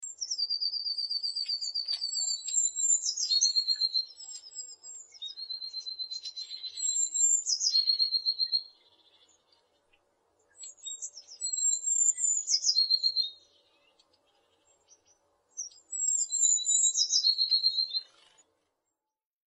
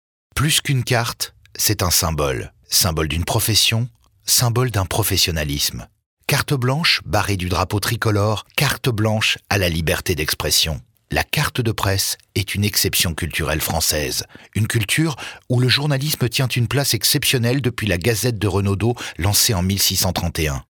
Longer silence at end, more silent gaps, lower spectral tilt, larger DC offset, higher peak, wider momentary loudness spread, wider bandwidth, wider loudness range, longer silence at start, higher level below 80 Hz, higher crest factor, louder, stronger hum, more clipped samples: first, 1.45 s vs 0.1 s; second, none vs 6.06-6.17 s; second, 6.5 dB/octave vs -3.5 dB/octave; neither; second, -12 dBFS vs -4 dBFS; first, 17 LU vs 7 LU; second, 10.5 kHz vs 20 kHz; first, 8 LU vs 2 LU; second, 0 s vs 0.35 s; second, under -90 dBFS vs -40 dBFS; about the same, 18 dB vs 16 dB; second, -27 LUFS vs -18 LUFS; neither; neither